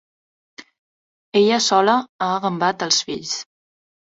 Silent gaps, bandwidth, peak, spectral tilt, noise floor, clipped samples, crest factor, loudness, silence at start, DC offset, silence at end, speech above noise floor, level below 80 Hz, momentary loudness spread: 0.79-1.32 s, 2.09-2.19 s; 8 kHz; -2 dBFS; -3 dB/octave; under -90 dBFS; under 0.1%; 20 dB; -19 LUFS; 0.6 s; under 0.1%; 0.7 s; over 71 dB; -66 dBFS; 10 LU